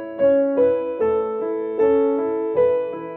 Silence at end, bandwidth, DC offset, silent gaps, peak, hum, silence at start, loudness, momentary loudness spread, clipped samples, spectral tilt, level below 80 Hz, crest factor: 0 s; 3.8 kHz; under 0.1%; none; -8 dBFS; none; 0 s; -20 LUFS; 7 LU; under 0.1%; -9.5 dB/octave; -56 dBFS; 12 dB